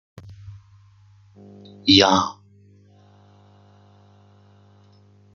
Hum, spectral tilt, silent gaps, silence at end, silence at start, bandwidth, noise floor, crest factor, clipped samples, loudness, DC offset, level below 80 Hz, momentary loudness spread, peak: 50 Hz at -45 dBFS; -4 dB/octave; none; 3.05 s; 0.45 s; 7.4 kHz; -53 dBFS; 24 dB; under 0.1%; -17 LUFS; under 0.1%; -64 dBFS; 30 LU; -2 dBFS